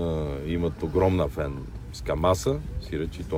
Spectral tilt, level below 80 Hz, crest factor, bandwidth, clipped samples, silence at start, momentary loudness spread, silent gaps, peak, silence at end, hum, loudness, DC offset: -6.5 dB/octave; -36 dBFS; 18 dB; 16 kHz; under 0.1%; 0 s; 10 LU; none; -10 dBFS; 0 s; none; -27 LUFS; under 0.1%